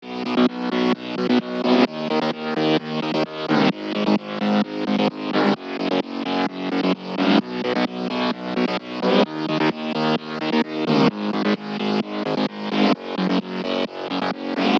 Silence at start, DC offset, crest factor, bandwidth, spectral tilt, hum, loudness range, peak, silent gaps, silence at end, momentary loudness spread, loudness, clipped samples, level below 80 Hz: 0 s; under 0.1%; 18 dB; 7.6 kHz; -6.5 dB/octave; none; 1 LU; -4 dBFS; none; 0 s; 5 LU; -22 LUFS; under 0.1%; -68 dBFS